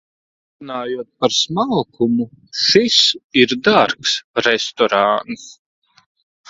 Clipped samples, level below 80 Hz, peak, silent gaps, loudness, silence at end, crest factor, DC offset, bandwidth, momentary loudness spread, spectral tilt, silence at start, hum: under 0.1%; -58 dBFS; 0 dBFS; 3.24-3.30 s, 4.24-4.34 s; -16 LUFS; 0.95 s; 18 dB; under 0.1%; 7.8 kHz; 13 LU; -3 dB/octave; 0.6 s; none